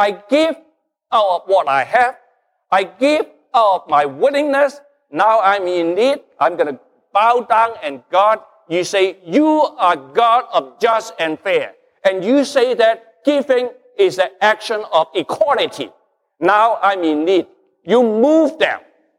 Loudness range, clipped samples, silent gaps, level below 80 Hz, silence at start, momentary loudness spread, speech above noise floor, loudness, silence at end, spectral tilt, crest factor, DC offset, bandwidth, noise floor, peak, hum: 1 LU; under 0.1%; none; -70 dBFS; 0 s; 7 LU; 44 dB; -16 LUFS; 0.4 s; -4 dB/octave; 14 dB; under 0.1%; 13.5 kHz; -59 dBFS; -2 dBFS; none